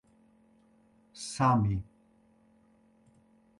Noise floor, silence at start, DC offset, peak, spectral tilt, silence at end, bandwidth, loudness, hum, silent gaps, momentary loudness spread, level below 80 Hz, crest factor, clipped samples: -65 dBFS; 1.15 s; under 0.1%; -12 dBFS; -6 dB/octave; 1.75 s; 11.5 kHz; -30 LUFS; none; none; 27 LU; -54 dBFS; 22 dB; under 0.1%